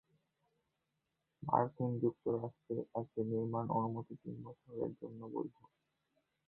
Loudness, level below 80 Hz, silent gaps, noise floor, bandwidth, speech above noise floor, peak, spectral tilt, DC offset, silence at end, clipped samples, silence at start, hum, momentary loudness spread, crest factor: -40 LUFS; -76 dBFS; none; -86 dBFS; 4 kHz; 47 dB; -16 dBFS; -11.5 dB/octave; under 0.1%; 0.95 s; under 0.1%; 1.4 s; none; 14 LU; 26 dB